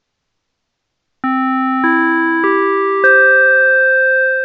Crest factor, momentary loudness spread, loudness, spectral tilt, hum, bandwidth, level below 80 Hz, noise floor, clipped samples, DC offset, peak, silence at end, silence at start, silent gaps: 12 dB; 8 LU; -11 LUFS; -6 dB/octave; none; 5.2 kHz; -76 dBFS; -72 dBFS; under 0.1%; under 0.1%; 0 dBFS; 0 s; 1.25 s; none